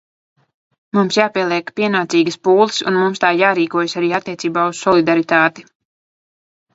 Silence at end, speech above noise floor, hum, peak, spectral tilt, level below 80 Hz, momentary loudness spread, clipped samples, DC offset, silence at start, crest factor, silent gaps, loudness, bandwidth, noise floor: 1.15 s; over 75 dB; none; 0 dBFS; -4.5 dB/octave; -62 dBFS; 5 LU; under 0.1%; under 0.1%; 0.95 s; 16 dB; none; -16 LUFS; 8 kHz; under -90 dBFS